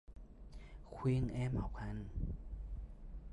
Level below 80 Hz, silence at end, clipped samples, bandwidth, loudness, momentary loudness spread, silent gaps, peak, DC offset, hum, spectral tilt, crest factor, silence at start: -48 dBFS; 0 s; under 0.1%; 10.5 kHz; -42 LUFS; 20 LU; none; -26 dBFS; under 0.1%; none; -8.5 dB/octave; 16 dB; 0.1 s